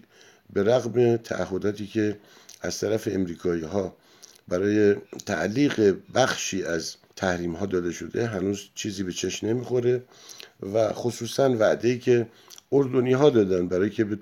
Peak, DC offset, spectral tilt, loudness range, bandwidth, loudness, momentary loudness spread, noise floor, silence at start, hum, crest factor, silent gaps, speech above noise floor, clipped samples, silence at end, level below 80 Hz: -6 dBFS; under 0.1%; -5.5 dB/octave; 5 LU; 16 kHz; -25 LUFS; 10 LU; -54 dBFS; 0.55 s; none; 20 dB; none; 30 dB; under 0.1%; 0 s; -60 dBFS